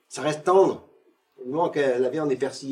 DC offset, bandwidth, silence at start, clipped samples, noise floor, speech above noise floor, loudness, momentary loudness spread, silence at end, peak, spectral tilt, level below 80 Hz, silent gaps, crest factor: under 0.1%; 11 kHz; 0.1 s; under 0.1%; -58 dBFS; 35 dB; -23 LUFS; 12 LU; 0 s; -6 dBFS; -5.5 dB/octave; -76 dBFS; none; 18 dB